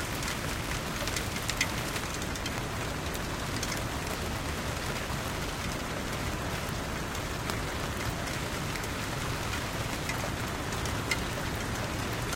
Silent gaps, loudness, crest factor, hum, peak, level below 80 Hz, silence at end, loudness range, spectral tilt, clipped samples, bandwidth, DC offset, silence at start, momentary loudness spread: none; -33 LUFS; 24 dB; none; -8 dBFS; -42 dBFS; 0 s; 1 LU; -3.5 dB/octave; under 0.1%; 17 kHz; under 0.1%; 0 s; 3 LU